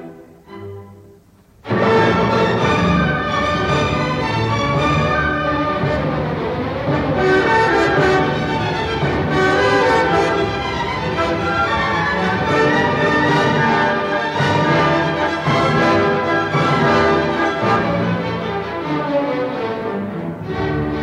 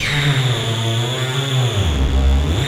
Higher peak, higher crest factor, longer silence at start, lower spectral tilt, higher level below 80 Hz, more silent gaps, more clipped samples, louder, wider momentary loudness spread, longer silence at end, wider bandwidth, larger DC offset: about the same, -4 dBFS vs -6 dBFS; about the same, 12 dB vs 10 dB; about the same, 0 s vs 0 s; about the same, -6 dB/octave vs -5 dB/octave; second, -38 dBFS vs -22 dBFS; neither; neither; about the same, -17 LUFS vs -18 LUFS; first, 8 LU vs 3 LU; about the same, 0 s vs 0 s; second, 12 kHz vs 15.5 kHz; neither